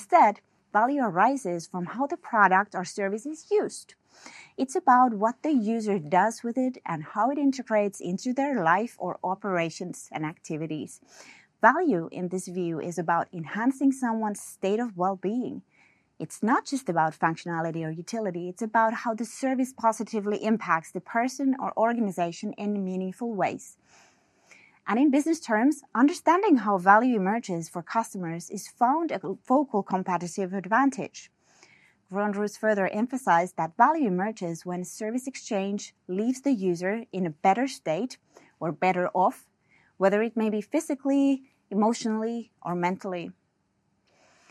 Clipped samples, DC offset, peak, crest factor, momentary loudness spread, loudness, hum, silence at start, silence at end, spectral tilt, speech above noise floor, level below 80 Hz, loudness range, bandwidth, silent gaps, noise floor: under 0.1%; under 0.1%; -4 dBFS; 22 dB; 12 LU; -27 LUFS; none; 0 s; 1.2 s; -5.5 dB/octave; 46 dB; -82 dBFS; 5 LU; 13 kHz; none; -73 dBFS